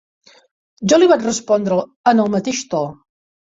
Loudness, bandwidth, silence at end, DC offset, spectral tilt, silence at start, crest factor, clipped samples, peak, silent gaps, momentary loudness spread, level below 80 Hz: -16 LUFS; 7.8 kHz; 0.6 s; under 0.1%; -4.5 dB/octave; 0.8 s; 16 dB; under 0.1%; -2 dBFS; 1.96-2.04 s; 11 LU; -58 dBFS